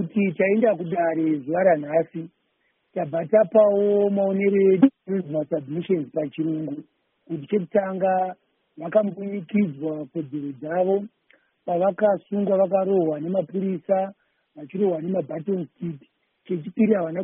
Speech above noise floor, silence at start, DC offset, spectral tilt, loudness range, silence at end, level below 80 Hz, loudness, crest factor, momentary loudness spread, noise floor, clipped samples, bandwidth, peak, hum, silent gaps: 48 dB; 0 s; under 0.1%; -5 dB/octave; 6 LU; 0 s; -70 dBFS; -23 LUFS; 20 dB; 13 LU; -70 dBFS; under 0.1%; 3.7 kHz; -4 dBFS; none; none